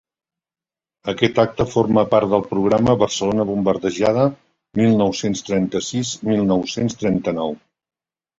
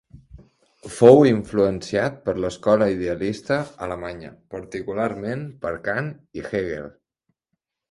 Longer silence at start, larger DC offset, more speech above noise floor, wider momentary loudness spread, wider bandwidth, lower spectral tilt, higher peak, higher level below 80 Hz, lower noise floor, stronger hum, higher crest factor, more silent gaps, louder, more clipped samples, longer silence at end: first, 1.05 s vs 0.35 s; neither; first, over 72 dB vs 58 dB; second, 7 LU vs 20 LU; second, 8 kHz vs 11.5 kHz; second, -5.5 dB/octave vs -7 dB/octave; about the same, 0 dBFS vs 0 dBFS; about the same, -50 dBFS vs -50 dBFS; first, under -90 dBFS vs -79 dBFS; neither; about the same, 18 dB vs 22 dB; neither; about the same, -19 LUFS vs -21 LUFS; neither; second, 0.8 s vs 1 s